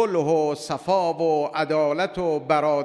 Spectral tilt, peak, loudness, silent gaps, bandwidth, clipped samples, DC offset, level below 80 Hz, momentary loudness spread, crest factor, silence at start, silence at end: -5.5 dB/octave; -6 dBFS; -23 LUFS; none; 11 kHz; under 0.1%; under 0.1%; -58 dBFS; 4 LU; 16 dB; 0 s; 0 s